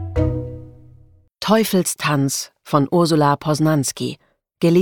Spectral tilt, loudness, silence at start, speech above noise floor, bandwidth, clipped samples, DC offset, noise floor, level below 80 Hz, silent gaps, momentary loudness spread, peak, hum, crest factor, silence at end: -5.5 dB/octave; -19 LUFS; 0 s; 32 dB; 19 kHz; under 0.1%; under 0.1%; -50 dBFS; -38 dBFS; none; 12 LU; -2 dBFS; none; 16 dB; 0 s